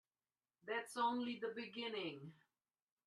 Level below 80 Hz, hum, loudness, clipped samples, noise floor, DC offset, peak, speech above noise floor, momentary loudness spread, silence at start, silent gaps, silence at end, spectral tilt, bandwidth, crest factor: under -90 dBFS; none; -44 LUFS; under 0.1%; under -90 dBFS; under 0.1%; -28 dBFS; over 46 dB; 17 LU; 0.65 s; none; 0.75 s; -4 dB/octave; 12.5 kHz; 20 dB